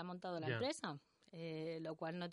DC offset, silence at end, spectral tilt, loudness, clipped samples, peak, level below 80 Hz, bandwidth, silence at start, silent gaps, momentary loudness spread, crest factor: under 0.1%; 0 s; -5.5 dB/octave; -45 LUFS; under 0.1%; -28 dBFS; -84 dBFS; 11.5 kHz; 0 s; none; 11 LU; 18 dB